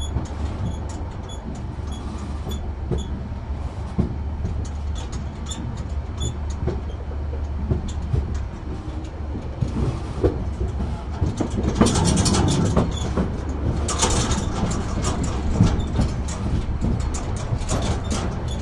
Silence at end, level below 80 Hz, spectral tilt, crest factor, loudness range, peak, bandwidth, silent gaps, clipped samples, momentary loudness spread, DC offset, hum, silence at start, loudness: 0 s; -28 dBFS; -5.5 dB/octave; 20 dB; 7 LU; -2 dBFS; 12 kHz; none; under 0.1%; 11 LU; under 0.1%; none; 0 s; -25 LUFS